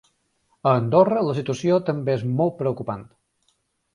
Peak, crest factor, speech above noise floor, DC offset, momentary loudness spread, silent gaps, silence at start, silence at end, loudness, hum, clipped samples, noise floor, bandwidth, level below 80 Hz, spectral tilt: -4 dBFS; 20 dB; 48 dB; under 0.1%; 10 LU; none; 0.65 s; 0.9 s; -22 LUFS; none; under 0.1%; -69 dBFS; 11 kHz; -60 dBFS; -8 dB/octave